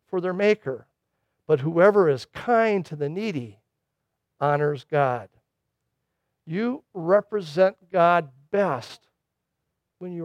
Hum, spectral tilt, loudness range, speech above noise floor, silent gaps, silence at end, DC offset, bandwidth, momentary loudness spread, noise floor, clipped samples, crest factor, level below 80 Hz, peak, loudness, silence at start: none; -7.5 dB/octave; 5 LU; 58 dB; none; 0 s; under 0.1%; 10.5 kHz; 14 LU; -81 dBFS; under 0.1%; 18 dB; -70 dBFS; -6 dBFS; -23 LUFS; 0.1 s